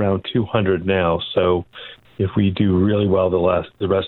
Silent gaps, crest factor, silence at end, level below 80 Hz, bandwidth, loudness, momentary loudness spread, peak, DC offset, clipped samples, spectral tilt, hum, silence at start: none; 16 dB; 0 s; -46 dBFS; 4.3 kHz; -19 LUFS; 7 LU; -2 dBFS; under 0.1%; under 0.1%; -10.5 dB/octave; none; 0 s